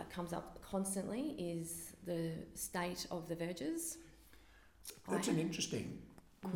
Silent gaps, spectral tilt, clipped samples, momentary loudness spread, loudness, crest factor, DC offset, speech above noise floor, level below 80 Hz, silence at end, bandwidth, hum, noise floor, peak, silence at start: none; -4.5 dB/octave; under 0.1%; 15 LU; -42 LUFS; 20 dB; under 0.1%; 22 dB; -66 dBFS; 0 s; 17.5 kHz; none; -64 dBFS; -22 dBFS; 0 s